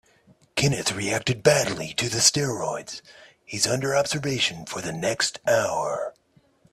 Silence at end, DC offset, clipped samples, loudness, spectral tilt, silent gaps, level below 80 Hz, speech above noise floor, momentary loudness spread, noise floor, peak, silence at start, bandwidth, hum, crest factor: 0.6 s; under 0.1%; under 0.1%; -24 LUFS; -3 dB/octave; none; -58 dBFS; 37 dB; 13 LU; -62 dBFS; -2 dBFS; 0.55 s; 14.5 kHz; none; 24 dB